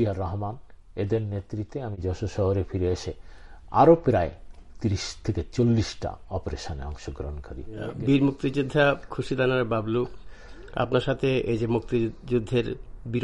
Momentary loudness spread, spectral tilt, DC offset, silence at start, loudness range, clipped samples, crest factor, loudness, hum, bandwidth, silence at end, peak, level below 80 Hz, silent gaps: 14 LU; -7 dB/octave; under 0.1%; 0 s; 5 LU; under 0.1%; 20 dB; -26 LUFS; none; 11 kHz; 0 s; -6 dBFS; -42 dBFS; none